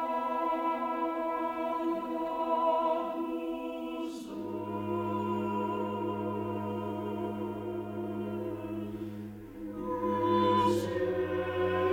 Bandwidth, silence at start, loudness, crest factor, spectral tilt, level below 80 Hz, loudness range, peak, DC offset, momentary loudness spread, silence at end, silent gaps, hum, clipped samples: 17 kHz; 0 s; -33 LUFS; 16 dB; -7 dB/octave; -62 dBFS; 5 LU; -16 dBFS; under 0.1%; 10 LU; 0 s; none; none; under 0.1%